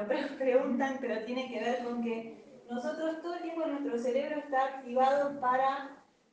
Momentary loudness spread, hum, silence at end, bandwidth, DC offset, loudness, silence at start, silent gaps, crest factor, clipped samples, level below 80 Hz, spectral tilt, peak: 10 LU; none; 0.3 s; 8.8 kHz; under 0.1%; -33 LUFS; 0 s; none; 18 dB; under 0.1%; -80 dBFS; -5 dB/octave; -14 dBFS